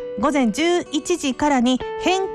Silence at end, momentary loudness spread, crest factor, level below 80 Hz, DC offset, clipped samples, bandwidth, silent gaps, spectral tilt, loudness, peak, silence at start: 0 s; 4 LU; 12 dB; -48 dBFS; under 0.1%; under 0.1%; 13 kHz; none; -3.5 dB/octave; -20 LUFS; -8 dBFS; 0 s